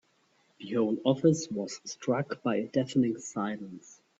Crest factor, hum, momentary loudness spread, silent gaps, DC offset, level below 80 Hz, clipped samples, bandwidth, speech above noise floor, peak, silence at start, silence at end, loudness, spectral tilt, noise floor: 18 dB; none; 14 LU; none; under 0.1%; -70 dBFS; under 0.1%; 8 kHz; 39 dB; -12 dBFS; 0.6 s; 0.25 s; -30 LUFS; -6 dB/octave; -69 dBFS